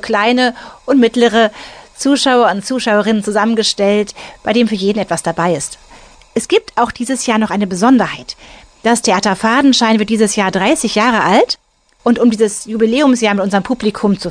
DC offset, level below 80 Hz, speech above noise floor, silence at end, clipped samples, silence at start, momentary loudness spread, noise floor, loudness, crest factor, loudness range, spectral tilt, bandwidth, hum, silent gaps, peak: under 0.1%; -48 dBFS; 28 dB; 0 s; under 0.1%; 0 s; 9 LU; -41 dBFS; -13 LUFS; 12 dB; 4 LU; -4 dB/octave; 10 kHz; none; none; -2 dBFS